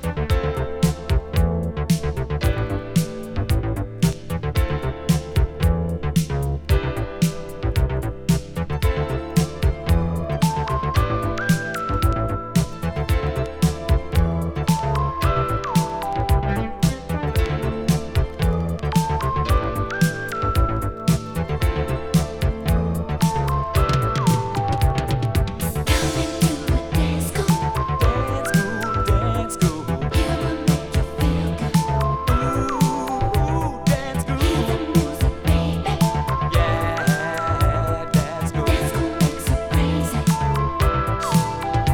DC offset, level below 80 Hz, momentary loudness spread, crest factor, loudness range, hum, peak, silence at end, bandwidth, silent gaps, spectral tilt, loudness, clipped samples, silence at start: under 0.1%; -26 dBFS; 4 LU; 16 dB; 2 LU; none; -4 dBFS; 0 s; 19.5 kHz; none; -6 dB/octave; -22 LUFS; under 0.1%; 0 s